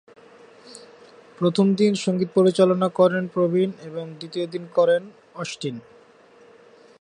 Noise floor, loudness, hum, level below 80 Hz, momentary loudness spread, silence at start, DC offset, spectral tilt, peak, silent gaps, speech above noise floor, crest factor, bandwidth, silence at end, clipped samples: -52 dBFS; -21 LUFS; none; -72 dBFS; 15 LU; 0.7 s; under 0.1%; -6.5 dB/octave; -4 dBFS; none; 31 dB; 18 dB; 10.5 kHz; 1.2 s; under 0.1%